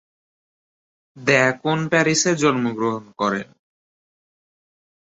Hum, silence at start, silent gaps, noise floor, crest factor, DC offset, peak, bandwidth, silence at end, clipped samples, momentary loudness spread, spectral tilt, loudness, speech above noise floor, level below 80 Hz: none; 1.15 s; none; under -90 dBFS; 20 dB; under 0.1%; -2 dBFS; 8.2 kHz; 1.6 s; under 0.1%; 8 LU; -4 dB/octave; -20 LUFS; over 70 dB; -62 dBFS